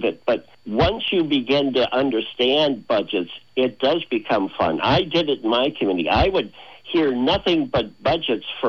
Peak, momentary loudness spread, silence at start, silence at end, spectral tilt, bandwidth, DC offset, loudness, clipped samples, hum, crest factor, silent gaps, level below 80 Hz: -6 dBFS; 6 LU; 0 s; 0 s; -6.5 dB/octave; 6.8 kHz; 0.3%; -21 LUFS; under 0.1%; none; 16 dB; none; -42 dBFS